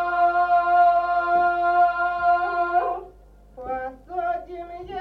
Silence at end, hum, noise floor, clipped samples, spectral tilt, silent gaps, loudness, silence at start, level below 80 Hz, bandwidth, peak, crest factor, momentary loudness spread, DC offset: 0 s; 50 Hz at -50 dBFS; -49 dBFS; under 0.1%; -6 dB/octave; none; -21 LUFS; 0 s; -50 dBFS; 5.2 kHz; -10 dBFS; 12 dB; 16 LU; under 0.1%